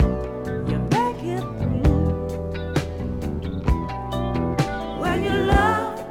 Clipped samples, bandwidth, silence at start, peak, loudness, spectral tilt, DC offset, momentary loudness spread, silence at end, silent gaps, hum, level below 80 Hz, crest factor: under 0.1%; 16.5 kHz; 0 s; -2 dBFS; -24 LUFS; -7 dB/octave; under 0.1%; 9 LU; 0 s; none; none; -30 dBFS; 20 dB